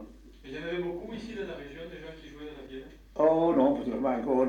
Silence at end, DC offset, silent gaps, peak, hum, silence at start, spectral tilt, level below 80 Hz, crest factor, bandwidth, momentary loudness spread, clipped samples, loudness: 0 s; under 0.1%; none; -12 dBFS; none; 0 s; -7.5 dB/octave; -54 dBFS; 18 dB; 9 kHz; 20 LU; under 0.1%; -29 LUFS